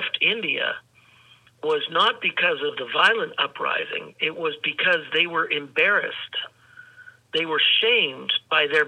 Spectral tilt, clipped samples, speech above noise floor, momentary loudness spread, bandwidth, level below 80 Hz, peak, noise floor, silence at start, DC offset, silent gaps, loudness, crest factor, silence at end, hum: -3.5 dB/octave; under 0.1%; 32 dB; 10 LU; 10 kHz; -78 dBFS; -4 dBFS; -55 dBFS; 0 s; under 0.1%; none; -22 LUFS; 20 dB; 0 s; none